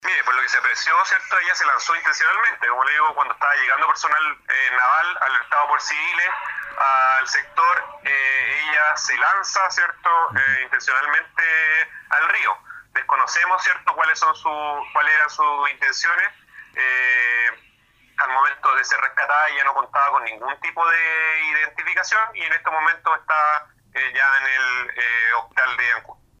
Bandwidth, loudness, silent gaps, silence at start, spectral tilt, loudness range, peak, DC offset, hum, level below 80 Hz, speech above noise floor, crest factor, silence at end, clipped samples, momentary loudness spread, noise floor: 9.8 kHz; -18 LUFS; none; 0.05 s; 0.5 dB/octave; 2 LU; -4 dBFS; under 0.1%; none; -66 dBFS; 37 dB; 16 dB; 0.25 s; under 0.1%; 5 LU; -57 dBFS